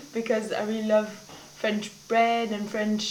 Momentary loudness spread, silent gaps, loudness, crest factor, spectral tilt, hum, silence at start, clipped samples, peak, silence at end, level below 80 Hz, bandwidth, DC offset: 11 LU; none; -27 LUFS; 16 dB; -4.5 dB/octave; none; 0 s; under 0.1%; -12 dBFS; 0 s; -70 dBFS; 17.5 kHz; under 0.1%